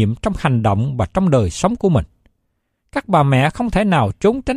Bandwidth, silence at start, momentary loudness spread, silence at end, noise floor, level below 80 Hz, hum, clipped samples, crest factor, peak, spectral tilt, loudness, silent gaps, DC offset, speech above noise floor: 12 kHz; 0 s; 5 LU; 0 s; -70 dBFS; -36 dBFS; none; under 0.1%; 14 dB; -2 dBFS; -7 dB/octave; -17 LUFS; none; under 0.1%; 54 dB